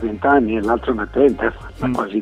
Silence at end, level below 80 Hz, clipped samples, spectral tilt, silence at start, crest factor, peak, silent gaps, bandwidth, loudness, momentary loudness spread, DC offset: 0 s; -38 dBFS; under 0.1%; -7.5 dB/octave; 0 s; 16 dB; -2 dBFS; none; 11 kHz; -18 LUFS; 7 LU; under 0.1%